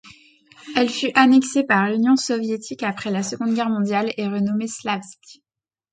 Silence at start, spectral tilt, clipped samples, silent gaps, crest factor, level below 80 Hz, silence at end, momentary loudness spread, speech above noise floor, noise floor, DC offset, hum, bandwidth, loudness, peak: 0.05 s; -4.5 dB/octave; under 0.1%; none; 20 dB; -66 dBFS; 0.6 s; 11 LU; 31 dB; -51 dBFS; under 0.1%; none; 9.4 kHz; -20 LUFS; 0 dBFS